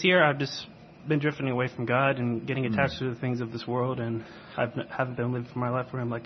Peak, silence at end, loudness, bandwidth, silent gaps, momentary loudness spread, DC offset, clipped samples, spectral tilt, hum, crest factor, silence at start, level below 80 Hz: -8 dBFS; 0 s; -29 LUFS; 6.4 kHz; none; 9 LU; under 0.1%; under 0.1%; -7 dB/octave; none; 20 dB; 0 s; -62 dBFS